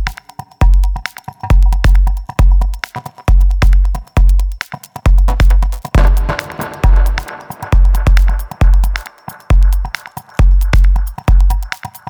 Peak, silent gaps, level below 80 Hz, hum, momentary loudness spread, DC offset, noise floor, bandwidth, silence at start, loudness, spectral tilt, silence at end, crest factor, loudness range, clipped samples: 0 dBFS; none; -10 dBFS; none; 13 LU; under 0.1%; -33 dBFS; 14 kHz; 0 s; -14 LUFS; -6 dB/octave; 0.2 s; 10 dB; 1 LU; under 0.1%